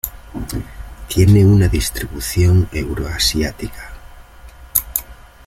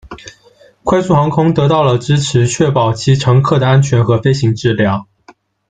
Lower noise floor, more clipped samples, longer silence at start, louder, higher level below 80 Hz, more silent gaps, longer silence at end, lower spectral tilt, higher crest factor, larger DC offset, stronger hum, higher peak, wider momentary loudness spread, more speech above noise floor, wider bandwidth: second, -39 dBFS vs -47 dBFS; neither; about the same, 0.05 s vs 0.05 s; second, -16 LUFS vs -12 LUFS; first, -30 dBFS vs -44 dBFS; neither; second, 0.35 s vs 0.65 s; about the same, -5.5 dB/octave vs -6.5 dB/octave; first, 18 dB vs 12 dB; neither; neither; about the same, 0 dBFS vs 0 dBFS; first, 19 LU vs 5 LU; second, 25 dB vs 35 dB; first, 16.5 kHz vs 9.2 kHz